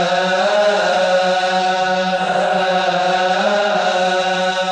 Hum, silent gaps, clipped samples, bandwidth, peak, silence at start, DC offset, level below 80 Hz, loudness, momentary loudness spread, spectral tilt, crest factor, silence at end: none; none; under 0.1%; 10 kHz; -4 dBFS; 0 s; under 0.1%; -58 dBFS; -16 LUFS; 2 LU; -3.5 dB/octave; 12 dB; 0 s